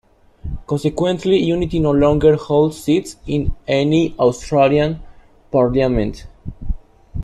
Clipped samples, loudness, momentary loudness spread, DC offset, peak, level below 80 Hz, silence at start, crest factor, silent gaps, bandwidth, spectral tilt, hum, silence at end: under 0.1%; -17 LUFS; 18 LU; under 0.1%; -2 dBFS; -32 dBFS; 0.45 s; 16 dB; none; 12.5 kHz; -7 dB/octave; none; 0 s